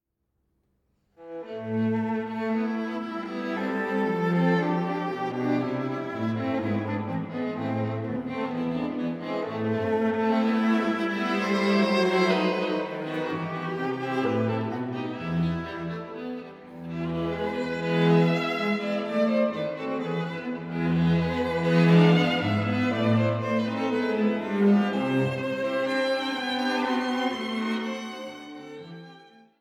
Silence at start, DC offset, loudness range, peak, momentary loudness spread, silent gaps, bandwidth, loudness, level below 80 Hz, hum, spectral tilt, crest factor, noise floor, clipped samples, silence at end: 1.2 s; under 0.1%; 7 LU; -8 dBFS; 11 LU; none; 10 kHz; -26 LUFS; -60 dBFS; none; -7 dB/octave; 18 dB; -76 dBFS; under 0.1%; 0.4 s